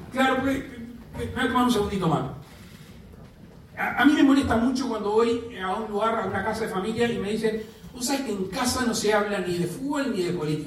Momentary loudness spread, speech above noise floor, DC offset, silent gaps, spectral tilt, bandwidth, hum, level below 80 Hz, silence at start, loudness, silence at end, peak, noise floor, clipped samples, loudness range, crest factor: 14 LU; 23 dB; under 0.1%; none; -5 dB/octave; 15 kHz; none; -50 dBFS; 0 s; -25 LUFS; 0 s; -8 dBFS; -47 dBFS; under 0.1%; 4 LU; 18 dB